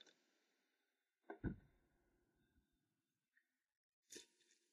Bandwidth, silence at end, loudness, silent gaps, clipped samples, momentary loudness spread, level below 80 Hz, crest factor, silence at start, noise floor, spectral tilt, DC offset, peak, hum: 11 kHz; 0.45 s; -55 LUFS; 3.77-4.03 s; under 0.1%; 10 LU; -70 dBFS; 28 dB; 0 s; under -90 dBFS; -5.5 dB/octave; under 0.1%; -32 dBFS; none